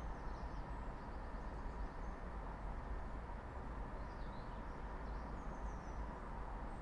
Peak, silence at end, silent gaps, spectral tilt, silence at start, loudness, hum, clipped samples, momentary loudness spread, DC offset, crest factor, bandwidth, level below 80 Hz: -34 dBFS; 0 s; none; -7.5 dB/octave; 0 s; -50 LUFS; none; under 0.1%; 1 LU; under 0.1%; 12 dB; 9.2 kHz; -48 dBFS